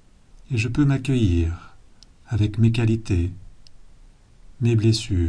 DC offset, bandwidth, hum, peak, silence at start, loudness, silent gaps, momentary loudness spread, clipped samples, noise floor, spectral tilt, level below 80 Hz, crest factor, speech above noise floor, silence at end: under 0.1%; 10.5 kHz; none; -6 dBFS; 0.5 s; -22 LUFS; none; 9 LU; under 0.1%; -49 dBFS; -7 dB/octave; -38 dBFS; 16 dB; 29 dB; 0 s